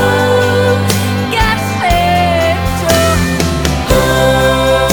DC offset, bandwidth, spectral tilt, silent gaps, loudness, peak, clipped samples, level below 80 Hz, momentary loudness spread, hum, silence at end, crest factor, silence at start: 0.7%; over 20 kHz; -4.5 dB/octave; none; -11 LUFS; 0 dBFS; under 0.1%; -22 dBFS; 4 LU; none; 0 s; 12 dB; 0 s